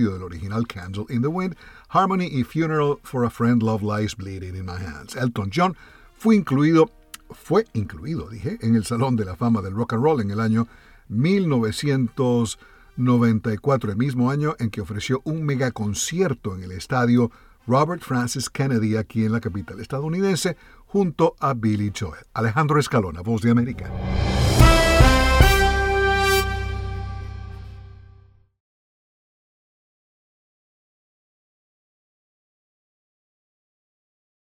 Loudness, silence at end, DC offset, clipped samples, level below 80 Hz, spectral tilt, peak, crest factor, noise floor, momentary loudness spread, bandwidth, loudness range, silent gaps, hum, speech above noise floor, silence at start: -22 LUFS; 6.6 s; under 0.1%; under 0.1%; -32 dBFS; -6 dB/octave; -2 dBFS; 20 dB; -52 dBFS; 14 LU; 17.5 kHz; 6 LU; none; none; 30 dB; 0 s